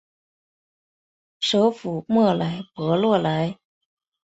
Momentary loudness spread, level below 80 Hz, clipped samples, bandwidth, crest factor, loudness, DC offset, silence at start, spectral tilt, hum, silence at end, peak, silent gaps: 9 LU; -64 dBFS; under 0.1%; 8.2 kHz; 18 dB; -22 LUFS; under 0.1%; 1.4 s; -6.5 dB/octave; none; 0.7 s; -6 dBFS; none